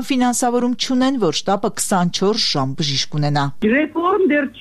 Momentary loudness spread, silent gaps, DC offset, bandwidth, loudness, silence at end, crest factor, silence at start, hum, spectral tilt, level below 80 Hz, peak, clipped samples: 3 LU; none; 2%; 13.5 kHz; -18 LUFS; 0 s; 12 dB; 0 s; none; -4.5 dB/octave; -52 dBFS; -6 dBFS; under 0.1%